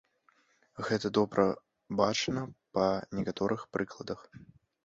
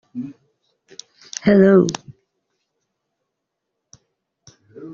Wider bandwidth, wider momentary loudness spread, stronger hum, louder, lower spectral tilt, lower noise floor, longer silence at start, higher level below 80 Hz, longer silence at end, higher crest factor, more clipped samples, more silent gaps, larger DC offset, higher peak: about the same, 8 kHz vs 7.4 kHz; second, 13 LU vs 28 LU; neither; second, -32 LUFS vs -15 LUFS; second, -5 dB/octave vs -7 dB/octave; second, -70 dBFS vs -79 dBFS; first, 0.75 s vs 0.15 s; second, -64 dBFS vs -58 dBFS; first, 0.4 s vs 0 s; about the same, 22 dB vs 20 dB; neither; neither; neither; second, -12 dBFS vs -2 dBFS